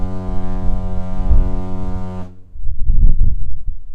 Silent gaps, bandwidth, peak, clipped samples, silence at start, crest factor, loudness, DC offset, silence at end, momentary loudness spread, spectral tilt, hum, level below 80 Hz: none; 1.8 kHz; 0 dBFS; 0.2%; 0 s; 12 dB; -23 LUFS; under 0.1%; 0 s; 13 LU; -9.5 dB/octave; none; -16 dBFS